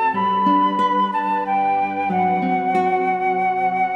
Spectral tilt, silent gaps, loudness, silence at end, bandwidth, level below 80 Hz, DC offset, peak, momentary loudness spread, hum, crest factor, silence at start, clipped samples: -7 dB/octave; none; -19 LUFS; 0 s; 7.8 kHz; -76 dBFS; under 0.1%; -6 dBFS; 3 LU; none; 12 dB; 0 s; under 0.1%